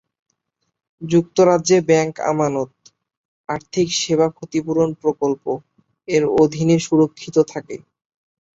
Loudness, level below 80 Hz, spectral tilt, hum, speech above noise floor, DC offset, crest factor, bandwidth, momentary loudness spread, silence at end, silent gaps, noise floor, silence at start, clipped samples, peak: -18 LUFS; -58 dBFS; -5.5 dB/octave; none; 57 dB; under 0.1%; 18 dB; 8 kHz; 14 LU; 0.8 s; 3.17-3.44 s; -74 dBFS; 1 s; under 0.1%; -2 dBFS